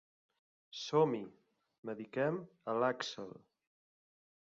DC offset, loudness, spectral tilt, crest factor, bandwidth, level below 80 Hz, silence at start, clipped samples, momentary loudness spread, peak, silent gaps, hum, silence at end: under 0.1%; -37 LUFS; -4 dB/octave; 22 dB; 7.4 kHz; -84 dBFS; 0.75 s; under 0.1%; 18 LU; -18 dBFS; 1.78-1.83 s; none; 1.15 s